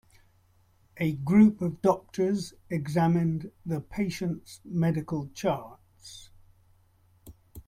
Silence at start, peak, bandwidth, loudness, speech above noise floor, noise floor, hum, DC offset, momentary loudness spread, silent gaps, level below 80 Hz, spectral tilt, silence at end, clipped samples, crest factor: 0.95 s; -10 dBFS; 15 kHz; -28 LUFS; 37 dB; -64 dBFS; none; under 0.1%; 16 LU; none; -58 dBFS; -7.5 dB/octave; 0.05 s; under 0.1%; 20 dB